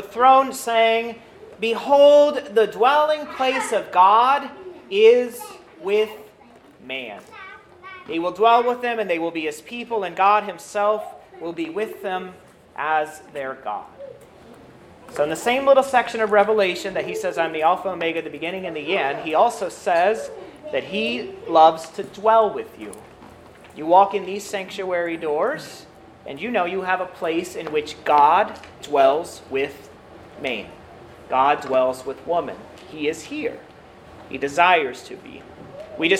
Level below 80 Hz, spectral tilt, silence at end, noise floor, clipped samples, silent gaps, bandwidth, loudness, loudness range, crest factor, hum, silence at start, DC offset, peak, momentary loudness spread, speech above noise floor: -62 dBFS; -3.5 dB/octave; 0 s; -49 dBFS; under 0.1%; none; 16 kHz; -20 LUFS; 7 LU; 20 dB; none; 0 s; under 0.1%; 0 dBFS; 22 LU; 29 dB